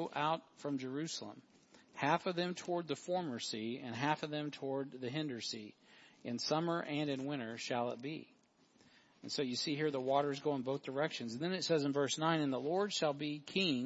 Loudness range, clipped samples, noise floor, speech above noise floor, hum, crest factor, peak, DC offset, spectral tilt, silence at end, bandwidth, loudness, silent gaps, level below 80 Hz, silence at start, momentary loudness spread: 4 LU; under 0.1%; -70 dBFS; 32 dB; none; 22 dB; -16 dBFS; under 0.1%; -3.5 dB/octave; 0 s; 7.6 kHz; -38 LUFS; none; -86 dBFS; 0 s; 8 LU